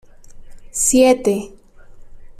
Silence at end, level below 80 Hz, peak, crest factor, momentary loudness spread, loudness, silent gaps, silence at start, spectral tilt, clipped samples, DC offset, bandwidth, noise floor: 0.1 s; -42 dBFS; -2 dBFS; 16 dB; 16 LU; -16 LUFS; none; 0.35 s; -3 dB/octave; under 0.1%; under 0.1%; 15 kHz; -39 dBFS